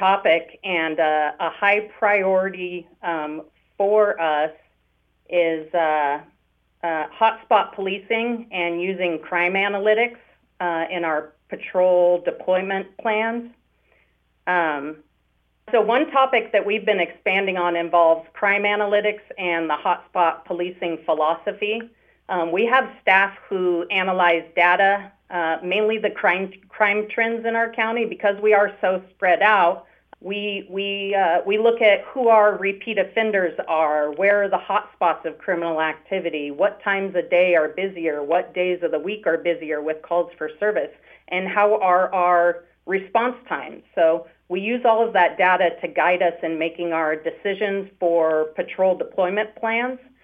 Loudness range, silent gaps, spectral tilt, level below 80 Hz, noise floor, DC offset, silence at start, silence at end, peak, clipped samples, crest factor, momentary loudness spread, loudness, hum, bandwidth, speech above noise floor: 4 LU; none; -7 dB/octave; -68 dBFS; -66 dBFS; under 0.1%; 0 s; 0.25 s; -2 dBFS; under 0.1%; 18 dB; 9 LU; -21 LUFS; none; 4.9 kHz; 45 dB